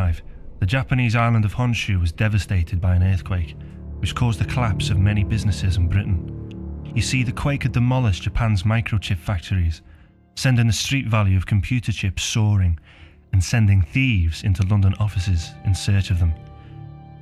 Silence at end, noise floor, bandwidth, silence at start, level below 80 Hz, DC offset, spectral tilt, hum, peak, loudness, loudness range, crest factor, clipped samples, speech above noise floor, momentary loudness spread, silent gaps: 0 s; -48 dBFS; 12.5 kHz; 0 s; -32 dBFS; under 0.1%; -5.5 dB/octave; none; -6 dBFS; -21 LUFS; 2 LU; 14 dB; under 0.1%; 29 dB; 11 LU; none